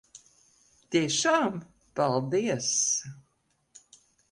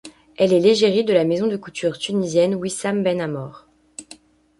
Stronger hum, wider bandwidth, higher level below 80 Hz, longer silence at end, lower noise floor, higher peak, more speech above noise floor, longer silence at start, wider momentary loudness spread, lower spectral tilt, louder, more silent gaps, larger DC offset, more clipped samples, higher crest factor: neither; about the same, 11.5 kHz vs 11.5 kHz; second, -68 dBFS vs -62 dBFS; first, 1.15 s vs 0.45 s; first, -73 dBFS vs -48 dBFS; second, -12 dBFS vs -4 dBFS; first, 46 dB vs 29 dB; about the same, 0.15 s vs 0.05 s; second, 12 LU vs 22 LU; second, -3 dB/octave vs -5 dB/octave; second, -27 LUFS vs -19 LUFS; neither; neither; neither; about the same, 18 dB vs 16 dB